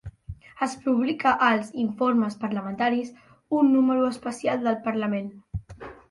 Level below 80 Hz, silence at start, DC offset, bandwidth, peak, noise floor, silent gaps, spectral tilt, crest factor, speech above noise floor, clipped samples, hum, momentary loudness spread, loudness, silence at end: -52 dBFS; 0.05 s; under 0.1%; 11.5 kHz; -8 dBFS; -43 dBFS; none; -6 dB/octave; 16 dB; 20 dB; under 0.1%; none; 18 LU; -24 LUFS; 0.15 s